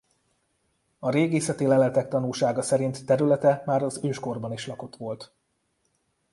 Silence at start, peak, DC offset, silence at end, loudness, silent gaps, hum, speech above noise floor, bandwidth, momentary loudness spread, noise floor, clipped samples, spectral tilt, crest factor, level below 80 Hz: 1 s; -8 dBFS; under 0.1%; 1.05 s; -25 LUFS; none; none; 49 dB; 11.5 kHz; 14 LU; -73 dBFS; under 0.1%; -6 dB/octave; 18 dB; -66 dBFS